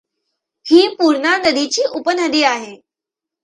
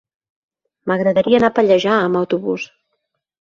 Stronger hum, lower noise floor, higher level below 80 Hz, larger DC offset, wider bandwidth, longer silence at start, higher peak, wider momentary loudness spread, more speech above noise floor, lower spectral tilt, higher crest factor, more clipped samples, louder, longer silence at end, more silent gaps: neither; first, -85 dBFS vs -73 dBFS; second, -62 dBFS vs -56 dBFS; neither; first, 10.5 kHz vs 7.4 kHz; second, 0.65 s vs 0.85 s; about the same, 0 dBFS vs -2 dBFS; about the same, 10 LU vs 12 LU; first, 71 dB vs 58 dB; second, -1.5 dB/octave vs -6.5 dB/octave; about the same, 16 dB vs 16 dB; neither; about the same, -15 LUFS vs -16 LUFS; about the same, 0.7 s vs 0.75 s; neither